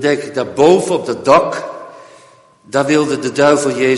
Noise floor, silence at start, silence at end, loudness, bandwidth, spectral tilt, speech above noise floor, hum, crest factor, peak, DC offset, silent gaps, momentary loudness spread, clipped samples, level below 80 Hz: -46 dBFS; 0 s; 0 s; -14 LUFS; 11.5 kHz; -5 dB/octave; 33 dB; none; 14 dB; 0 dBFS; under 0.1%; none; 10 LU; under 0.1%; -54 dBFS